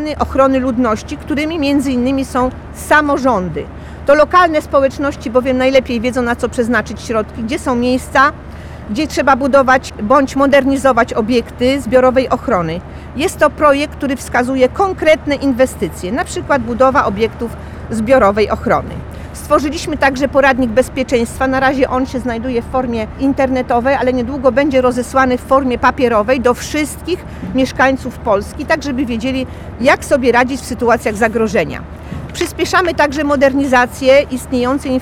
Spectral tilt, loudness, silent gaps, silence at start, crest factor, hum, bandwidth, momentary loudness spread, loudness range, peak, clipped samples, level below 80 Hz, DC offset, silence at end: -5 dB/octave; -14 LUFS; none; 0 s; 12 dB; none; 16 kHz; 10 LU; 3 LU; 0 dBFS; under 0.1%; -34 dBFS; under 0.1%; 0 s